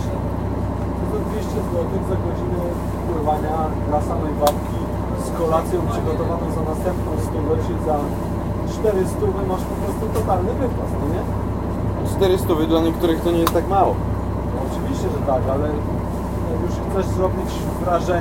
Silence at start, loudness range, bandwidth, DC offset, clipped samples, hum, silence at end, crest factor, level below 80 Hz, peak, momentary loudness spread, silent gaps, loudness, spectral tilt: 0 s; 3 LU; 16.5 kHz; under 0.1%; under 0.1%; none; 0 s; 20 dB; -30 dBFS; 0 dBFS; 6 LU; none; -21 LUFS; -7.5 dB/octave